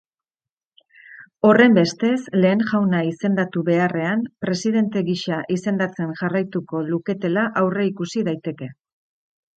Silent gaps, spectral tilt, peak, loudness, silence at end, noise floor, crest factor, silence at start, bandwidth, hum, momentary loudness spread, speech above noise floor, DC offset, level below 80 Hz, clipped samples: none; -6.5 dB/octave; 0 dBFS; -20 LUFS; 0.85 s; under -90 dBFS; 20 dB; 1.1 s; 8.8 kHz; none; 9 LU; over 70 dB; under 0.1%; -66 dBFS; under 0.1%